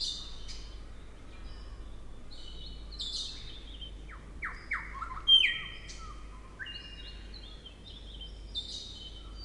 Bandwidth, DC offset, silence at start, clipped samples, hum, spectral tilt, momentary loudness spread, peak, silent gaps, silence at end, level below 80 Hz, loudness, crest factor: 11.5 kHz; under 0.1%; 0 s; under 0.1%; none; -1.5 dB/octave; 19 LU; -14 dBFS; none; 0 s; -46 dBFS; -30 LUFS; 24 dB